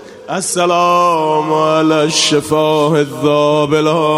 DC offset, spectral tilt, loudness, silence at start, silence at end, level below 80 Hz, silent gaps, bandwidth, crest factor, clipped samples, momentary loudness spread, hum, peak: under 0.1%; -4 dB/octave; -12 LUFS; 0 s; 0 s; -54 dBFS; none; 15.5 kHz; 12 dB; under 0.1%; 3 LU; none; 0 dBFS